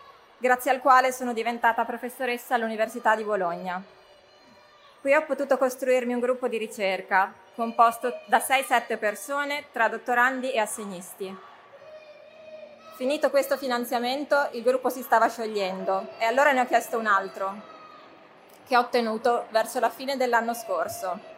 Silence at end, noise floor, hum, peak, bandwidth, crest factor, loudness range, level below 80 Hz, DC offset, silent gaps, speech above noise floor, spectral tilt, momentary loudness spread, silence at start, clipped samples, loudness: 0 s; -54 dBFS; none; -6 dBFS; 16 kHz; 20 dB; 4 LU; -80 dBFS; under 0.1%; none; 29 dB; -3 dB/octave; 11 LU; 0.05 s; under 0.1%; -25 LUFS